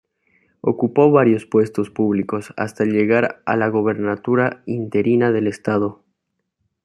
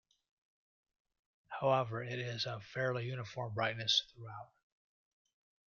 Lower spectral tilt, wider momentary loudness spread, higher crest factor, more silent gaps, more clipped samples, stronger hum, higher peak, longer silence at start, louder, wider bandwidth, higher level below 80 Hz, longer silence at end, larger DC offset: first, -8 dB/octave vs -2.5 dB/octave; second, 9 LU vs 18 LU; second, 16 dB vs 22 dB; neither; neither; neither; first, -2 dBFS vs -18 dBFS; second, 0.65 s vs 1.5 s; first, -19 LUFS vs -36 LUFS; first, 11.5 kHz vs 7.2 kHz; first, -64 dBFS vs -76 dBFS; second, 0.9 s vs 1.2 s; neither